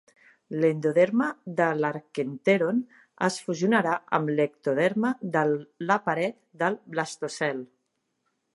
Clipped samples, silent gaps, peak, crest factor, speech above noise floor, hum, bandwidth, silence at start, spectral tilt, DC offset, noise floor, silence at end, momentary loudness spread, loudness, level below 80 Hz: under 0.1%; none; -6 dBFS; 20 dB; 51 dB; none; 11.5 kHz; 0.5 s; -6 dB/octave; under 0.1%; -77 dBFS; 0.9 s; 8 LU; -26 LUFS; -78 dBFS